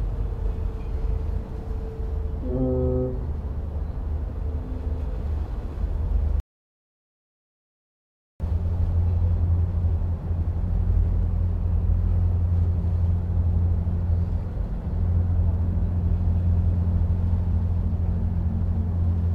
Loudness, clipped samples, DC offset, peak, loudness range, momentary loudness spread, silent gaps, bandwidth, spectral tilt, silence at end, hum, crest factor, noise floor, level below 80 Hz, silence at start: -26 LUFS; under 0.1%; under 0.1%; -12 dBFS; 6 LU; 8 LU; 6.40-8.40 s; 2.6 kHz; -11 dB/octave; 0 s; none; 12 dB; under -90 dBFS; -28 dBFS; 0 s